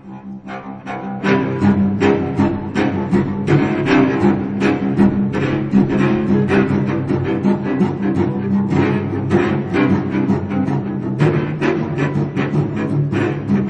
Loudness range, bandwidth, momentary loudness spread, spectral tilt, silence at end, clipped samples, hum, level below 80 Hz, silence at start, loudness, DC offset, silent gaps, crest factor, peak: 2 LU; 8.2 kHz; 5 LU; -8.5 dB/octave; 0 s; under 0.1%; none; -44 dBFS; 0.05 s; -17 LUFS; under 0.1%; none; 16 dB; 0 dBFS